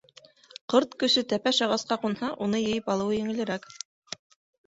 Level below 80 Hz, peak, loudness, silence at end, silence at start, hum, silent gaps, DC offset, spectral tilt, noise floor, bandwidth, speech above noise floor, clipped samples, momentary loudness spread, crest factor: -66 dBFS; -8 dBFS; -26 LUFS; 0.9 s; 0.7 s; none; none; under 0.1%; -4 dB/octave; -55 dBFS; 8 kHz; 28 dB; under 0.1%; 18 LU; 20 dB